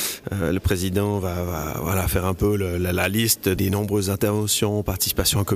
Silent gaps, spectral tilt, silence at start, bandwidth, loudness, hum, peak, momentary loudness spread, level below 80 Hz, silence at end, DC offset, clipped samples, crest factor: none; -4.5 dB/octave; 0 s; 15.5 kHz; -22 LUFS; none; -6 dBFS; 6 LU; -38 dBFS; 0 s; under 0.1%; under 0.1%; 16 dB